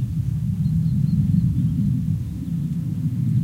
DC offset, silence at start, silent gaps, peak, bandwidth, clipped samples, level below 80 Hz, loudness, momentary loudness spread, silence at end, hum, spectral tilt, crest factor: under 0.1%; 0 s; none; -8 dBFS; 11.5 kHz; under 0.1%; -36 dBFS; -22 LUFS; 6 LU; 0 s; none; -9.5 dB/octave; 12 dB